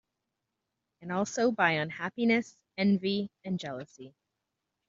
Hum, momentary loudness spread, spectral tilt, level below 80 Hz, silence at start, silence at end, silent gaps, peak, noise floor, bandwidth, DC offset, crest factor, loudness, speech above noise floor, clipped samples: none; 16 LU; -4.5 dB/octave; -74 dBFS; 1 s; 0.8 s; none; -10 dBFS; -85 dBFS; 7.8 kHz; under 0.1%; 22 dB; -30 LUFS; 55 dB; under 0.1%